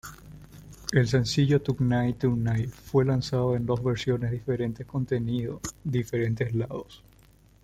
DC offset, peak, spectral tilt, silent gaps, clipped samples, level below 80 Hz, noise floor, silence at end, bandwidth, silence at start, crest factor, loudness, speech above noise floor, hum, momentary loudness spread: under 0.1%; -8 dBFS; -6.5 dB/octave; none; under 0.1%; -50 dBFS; -57 dBFS; 0.7 s; 14.5 kHz; 0.05 s; 20 dB; -27 LUFS; 31 dB; none; 11 LU